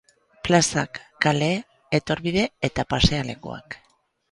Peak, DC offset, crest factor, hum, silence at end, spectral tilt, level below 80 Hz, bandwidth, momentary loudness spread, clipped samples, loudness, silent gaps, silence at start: -2 dBFS; under 0.1%; 24 dB; none; 0.55 s; -4.5 dB/octave; -40 dBFS; 11.5 kHz; 16 LU; under 0.1%; -23 LUFS; none; 0.45 s